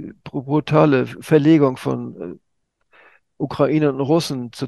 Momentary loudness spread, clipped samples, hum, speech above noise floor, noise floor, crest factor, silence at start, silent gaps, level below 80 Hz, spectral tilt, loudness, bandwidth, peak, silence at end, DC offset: 16 LU; under 0.1%; none; 48 dB; -66 dBFS; 18 dB; 0 s; none; -56 dBFS; -7 dB/octave; -18 LUFS; 12.5 kHz; 0 dBFS; 0 s; under 0.1%